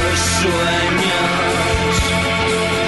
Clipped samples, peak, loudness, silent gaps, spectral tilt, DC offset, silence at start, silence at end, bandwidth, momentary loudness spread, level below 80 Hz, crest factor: under 0.1%; -6 dBFS; -16 LUFS; none; -3.5 dB/octave; under 0.1%; 0 s; 0 s; 12 kHz; 1 LU; -30 dBFS; 10 dB